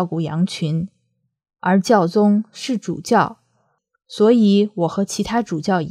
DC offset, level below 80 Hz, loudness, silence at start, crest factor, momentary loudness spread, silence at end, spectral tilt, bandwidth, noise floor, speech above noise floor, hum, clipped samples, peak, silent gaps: under 0.1%; -56 dBFS; -18 LUFS; 0 s; 18 dB; 10 LU; 0 s; -6 dB/octave; 13.5 kHz; -69 dBFS; 51 dB; none; under 0.1%; -2 dBFS; none